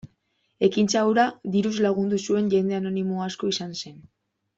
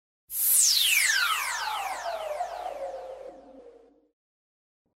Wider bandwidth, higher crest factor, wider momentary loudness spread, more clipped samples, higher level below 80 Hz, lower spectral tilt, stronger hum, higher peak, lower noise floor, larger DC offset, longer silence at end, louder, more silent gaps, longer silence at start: second, 8 kHz vs 16.5 kHz; about the same, 18 dB vs 20 dB; second, 8 LU vs 19 LU; neither; about the same, -64 dBFS vs -66 dBFS; first, -5 dB/octave vs 3.5 dB/octave; neither; first, -6 dBFS vs -10 dBFS; first, -71 dBFS vs -54 dBFS; neither; second, 0.6 s vs 1.25 s; about the same, -24 LUFS vs -24 LUFS; neither; second, 0.05 s vs 0.3 s